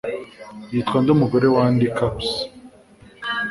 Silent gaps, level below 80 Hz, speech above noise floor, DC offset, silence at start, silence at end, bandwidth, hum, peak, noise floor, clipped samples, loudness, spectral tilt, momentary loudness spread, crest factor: none; -48 dBFS; 29 dB; under 0.1%; 0.05 s; 0 s; 11.5 kHz; none; -2 dBFS; -48 dBFS; under 0.1%; -20 LUFS; -7 dB/octave; 16 LU; 18 dB